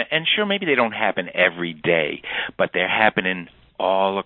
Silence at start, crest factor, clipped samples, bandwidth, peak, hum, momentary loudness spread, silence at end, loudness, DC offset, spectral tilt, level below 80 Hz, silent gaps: 0 s; 20 dB; under 0.1%; 4.2 kHz; -2 dBFS; none; 8 LU; 0.05 s; -20 LUFS; under 0.1%; -9.5 dB/octave; -60 dBFS; none